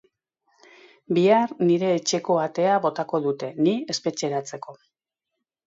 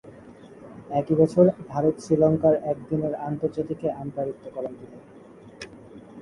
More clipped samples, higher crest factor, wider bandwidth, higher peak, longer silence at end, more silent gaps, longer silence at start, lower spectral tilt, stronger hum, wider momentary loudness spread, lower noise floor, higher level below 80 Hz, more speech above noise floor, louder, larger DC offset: neither; about the same, 18 dB vs 20 dB; second, 7.8 kHz vs 11.5 kHz; about the same, -6 dBFS vs -6 dBFS; first, 0.95 s vs 0 s; neither; first, 1.1 s vs 0.05 s; second, -5 dB/octave vs -9 dB/octave; neither; second, 9 LU vs 23 LU; first, -84 dBFS vs -46 dBFS; second, -74 dBFS vs -58 dBFS; first, 62 dB vs 23 dB; about the same, -23 LUFS vs -24 LUFS; neither